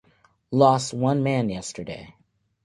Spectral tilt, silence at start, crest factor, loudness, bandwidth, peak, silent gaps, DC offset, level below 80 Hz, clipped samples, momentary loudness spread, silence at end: -6 dB/octave; 0.5 s; 20 dB; -23 LUFS; 11.5 kHz; -4 dBFS; none; under 0.1%; -58 dBFS; under 0.1%; 17 LU; 0.55 s